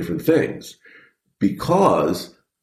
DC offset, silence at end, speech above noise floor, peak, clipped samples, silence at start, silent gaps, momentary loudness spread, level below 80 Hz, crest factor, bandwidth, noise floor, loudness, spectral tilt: under 0.1%; 0.35 s; 33 dB; -2 dBFS; under 0.1%; 0 s; none; 20 LU; -52 dBFS; 18 dB; 15 kHz; -52 dBFS; -20 LUFS; -6.5 dB/octave